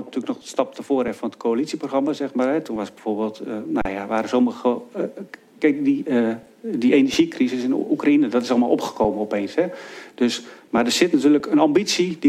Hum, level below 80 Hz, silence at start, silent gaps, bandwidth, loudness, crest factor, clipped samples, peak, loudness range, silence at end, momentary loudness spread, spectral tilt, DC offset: none; -54 dBFS; 0 s; none; 14.5 kHz; -21 LUFS; 20 dB; under 0.1%; -2 dBFS; 4 LU; 0 s; 11 LU; -4.5 dB/octave; under 0.1%